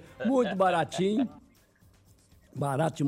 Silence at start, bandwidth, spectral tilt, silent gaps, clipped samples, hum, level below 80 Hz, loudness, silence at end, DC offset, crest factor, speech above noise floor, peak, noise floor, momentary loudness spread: 0 s; 16 kHz; -6.5 dB/octave; none; under 0.1%; none; -64 dBFS; -28 LUFS; 0 s; under 0.1%; 16 dB; 34 dB; -14 dBFS; -61 dBFS; 9 LU